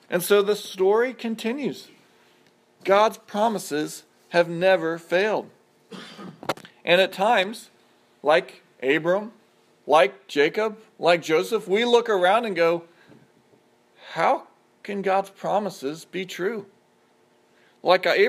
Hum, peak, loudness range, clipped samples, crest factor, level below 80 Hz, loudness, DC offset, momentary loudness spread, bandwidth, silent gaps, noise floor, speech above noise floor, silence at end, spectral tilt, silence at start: none; -4 dBFS; 5 LU; under 0.1%; 20 dB; -82 dBFS; -23 LUFS; under 0.1%; 14 LU; 15.5 kHz; none; -61 dBFS; 39 dB; 0 s; -4 dB/octave; 0.1 s